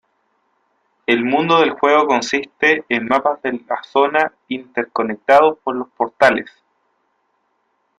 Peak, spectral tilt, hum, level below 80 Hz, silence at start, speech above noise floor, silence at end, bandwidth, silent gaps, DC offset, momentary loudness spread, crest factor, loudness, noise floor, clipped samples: 0 dBFS; -4.5 dB/octave; none; -60 dBFS; 1.1 s; 50 dB; 1.55 s; 10.5 kHz; none; under 0.1%; 11 LU; 18 dB; -17 LUFS; -67 dBFS; under 0.1%